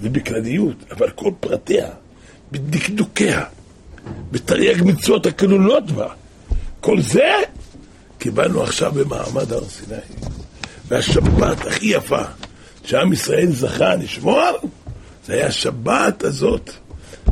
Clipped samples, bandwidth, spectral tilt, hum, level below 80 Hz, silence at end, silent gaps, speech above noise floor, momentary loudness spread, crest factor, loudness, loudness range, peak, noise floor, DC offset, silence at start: under 0.1%; 15.5 kHz; -5 dB/octave; none; -34 dBFS; 0 s; none; 26 dB; 18 LU; 16 dB; -18 LUFS; 4 LU; -2 dBFS; -44 dBFS; under 0.1%; 0 s